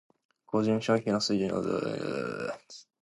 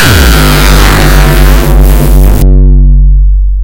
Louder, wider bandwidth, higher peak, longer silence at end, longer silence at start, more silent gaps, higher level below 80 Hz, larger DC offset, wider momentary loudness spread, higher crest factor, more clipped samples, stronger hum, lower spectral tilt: second, -30 LUFS vs -6 LUFS; second, 11.5 kHz vs 17 kHz; second, -12 dBFS vs 0 dBFS; first, 0.2 s vs 0 s; first, 0.5 s vs 0 s; neither; second, -66 dBFS vs -4 dBFS; second, under 0.1% vs 6%; first, 10 LU vs 2 LU; first, 18 dB vs 2 dB; second, under 0.1% vs 20%; neither; about the same, -5.5 dB/octave vs -5 dB/octave